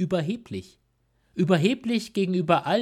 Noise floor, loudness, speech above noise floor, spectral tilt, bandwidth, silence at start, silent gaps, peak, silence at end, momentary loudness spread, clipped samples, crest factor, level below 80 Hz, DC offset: -68 dBFS; -25 LUFS; 44 dB; -6.5 dB/octave; 14 kHz; 0 s; none; -6 dBFS; 0 s; 16 LU; under 0.1%; 18 dB; -64 dBFS; under 0.1%